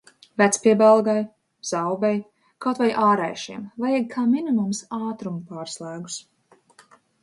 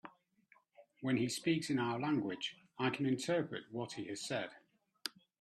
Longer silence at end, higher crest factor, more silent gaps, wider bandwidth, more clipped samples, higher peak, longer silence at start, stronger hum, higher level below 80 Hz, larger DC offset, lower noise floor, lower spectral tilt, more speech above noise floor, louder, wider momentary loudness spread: first, 1 s vs 0.35 s; about the same, 20 dB vs 22 dB; neither; second, 11.5 kHz vs 13.5 kHz; neither; first, -4 dBFS vs -18 dBFS; first, 0.4 s vs 0.05 s; neither; first, -72 dBFS vs -80 dBFS; neither; second, -55 dBFS vs -71 dBFS; about the same, -5 dB/octave vs -5 dB/octave; about the same, 34 dB vs 34 dB; first, -22 LUFS vs -38 LUFS; first, 18 LU vs 11 LU